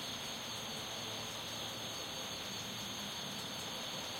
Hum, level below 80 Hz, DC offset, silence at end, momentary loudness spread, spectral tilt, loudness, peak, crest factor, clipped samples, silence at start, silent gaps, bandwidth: none; -68 dBFS; under 0.1%; 0 s; 0 LU; -2 dB/octave; -41 LUFS; -30 dBFS; 14 dB; under 0.1%; 0 s; none; 16 kHz